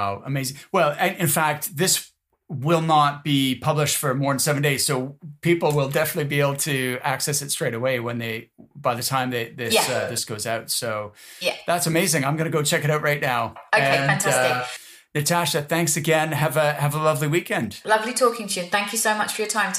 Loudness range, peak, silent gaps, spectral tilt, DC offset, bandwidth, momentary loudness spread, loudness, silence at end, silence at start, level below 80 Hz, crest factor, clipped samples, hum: 3 LU; -6 dBFS; none; -3.5 dB/octave; under 0.1%; 15.5 kHz; 8 LU; -22 LUFS; 0 s; 0 s; -64 dBFS; 16 dB; under 0.1%; none